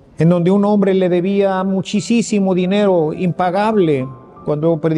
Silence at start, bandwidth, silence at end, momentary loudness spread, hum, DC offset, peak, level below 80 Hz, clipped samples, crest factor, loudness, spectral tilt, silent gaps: 0.2 s; 10.5 kHz; 0 s; 5 LU; none; under 0.1%; -2 dBFS; -54 dBFS; under 0.1%; 12 dB; -15 LUFS; -7 dB/octave; none